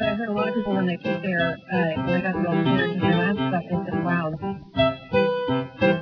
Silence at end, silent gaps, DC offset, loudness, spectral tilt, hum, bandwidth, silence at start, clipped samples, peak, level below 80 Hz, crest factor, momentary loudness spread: 0 s; none; under 0.1%; -24 LUFS; -9 dB/octave; none; 5.4 kHz; 0 s; under 0.1%; -6 dBFS; -50 dBFS; 18 dB; 5 LU